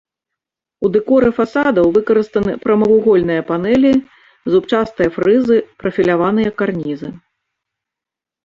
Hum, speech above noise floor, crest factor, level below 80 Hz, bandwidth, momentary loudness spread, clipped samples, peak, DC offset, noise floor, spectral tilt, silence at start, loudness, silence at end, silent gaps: none; 72 dB; 12 dB; -48 dBFS; 7.4 kHz; 8 LU; under 0.1%; -2 dBFS; under 0.1%; -86 dBFS; -8 dB/octave; 0.8 s; -15 LUFS; 1.3 s; none